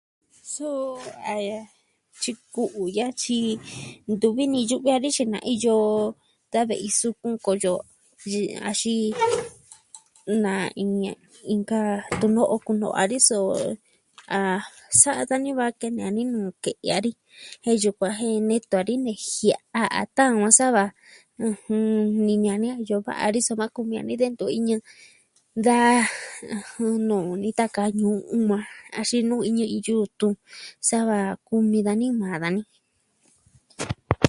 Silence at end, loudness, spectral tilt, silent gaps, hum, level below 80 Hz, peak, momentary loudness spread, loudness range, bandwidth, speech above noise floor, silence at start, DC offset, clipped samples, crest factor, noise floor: 0 s; -23 LUFS; -4 dB/octave; none; none; -56 dBFS; 0 dBFS; 11 LU; 5 LU; 11.5 kHz; 43 dB; 0.45 s; under 0.1%; under 0.1%; 24 dB; -67 dBFS